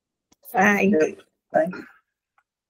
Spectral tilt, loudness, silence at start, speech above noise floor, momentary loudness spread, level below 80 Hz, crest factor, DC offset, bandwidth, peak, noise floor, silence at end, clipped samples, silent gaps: -6 dB/octave; -21 LUFS; 0.45 s; 50 dB; 10 LU; -68 dBFS; 20 dB; under 0.1%; 16 kHz; -4 dBFS; -71 dBFS; 0.85 s; under 0.1%; none